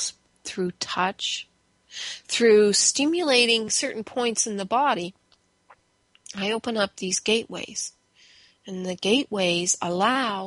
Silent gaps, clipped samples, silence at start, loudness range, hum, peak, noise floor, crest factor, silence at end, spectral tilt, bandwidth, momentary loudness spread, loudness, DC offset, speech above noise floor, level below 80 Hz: none; under 0.1%; 0 s; 8 LU; none; -6 dBFS; -65 dBFS; 20 dB; 0 s; -2 dB/octave; 11.5 kHz; 15 LU; -23 LUFS; under 0.1%; 41 dB; -68 dBFS